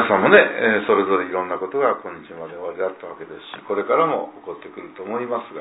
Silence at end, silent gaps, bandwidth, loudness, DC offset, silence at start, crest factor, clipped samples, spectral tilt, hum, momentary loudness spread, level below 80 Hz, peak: 0 s; none; 4 kHz; -19 LUFS; under 0.1%; 0 s; 20 dB; under 0.1%; -8.5 dB/octave; none; 22 LU; -66 dBFS; 0 dBFS